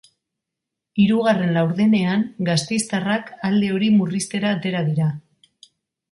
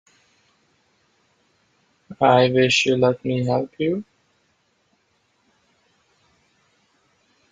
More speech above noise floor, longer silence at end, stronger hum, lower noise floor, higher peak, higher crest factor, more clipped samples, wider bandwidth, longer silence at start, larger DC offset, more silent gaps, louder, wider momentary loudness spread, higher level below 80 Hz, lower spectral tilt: first, 64 dB vs 48 dB; second, 0.95 s vs 3.5 s; neither; first, -83 dBFS vs -66 dBFS; second, -6 dBFS vs -2 dBFS; second, 14 dB vs 22 dB; neither; first, 11.5 kHz vs 9.4 kHz; second, 0.95 s vs 2.1 s; neither; neither; about the same, -20 LUFS vs -19 LUFS; second, 6 LU vs 9 LU; about the same, -60 dBFS vs -64 dBFS; about the same, -5.5 dB/octave vs -5 dB/octave